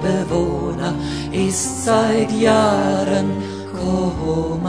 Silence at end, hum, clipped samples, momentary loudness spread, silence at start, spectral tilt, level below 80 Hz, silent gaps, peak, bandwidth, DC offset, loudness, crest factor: 0 s; none; under 0.1%; 8 LU; 0 s; -5 dB/octave; -38 dBFS; none; -2 dBFS; 11 kHz; 0.4%; -19 LUFS; 16 dB